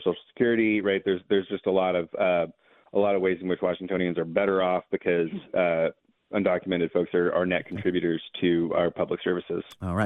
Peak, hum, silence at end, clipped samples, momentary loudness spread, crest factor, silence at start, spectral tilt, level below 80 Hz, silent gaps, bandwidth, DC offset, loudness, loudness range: -10 dBFS; none; 0 s; under 0.1%; 5 LU; 16 dB; 0 s; -8 dB/octave; -64 dBFS; none; 9.8 kHz; under 0.1%; -26 LUFS; 1 LU